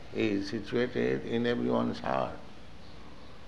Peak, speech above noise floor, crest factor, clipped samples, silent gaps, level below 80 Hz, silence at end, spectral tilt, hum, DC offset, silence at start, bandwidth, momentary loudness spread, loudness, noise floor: -16 dBFS; 20 dB; 18 dB; under 0.1%; none; -56 dBFS; 0 s; -6.5 dB/octave; none; 0.7%; 0 s; 9.4 kHz; 21 LU; -31 LUFS; -50 dBFS